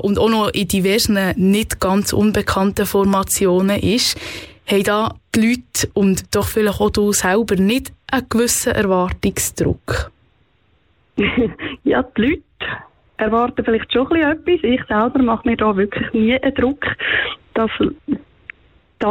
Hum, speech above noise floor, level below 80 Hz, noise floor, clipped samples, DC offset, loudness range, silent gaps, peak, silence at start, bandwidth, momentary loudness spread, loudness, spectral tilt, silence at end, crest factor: none; 42 dB; -38 dBFS; -59 dBFS; under 0.1%; under 0.1%; 4 LU; none; -4 dBFS; 0 s; 18 kHz; 7 LU; -17 LUFS; -4.5 dB/octave; 0 s; 14 dB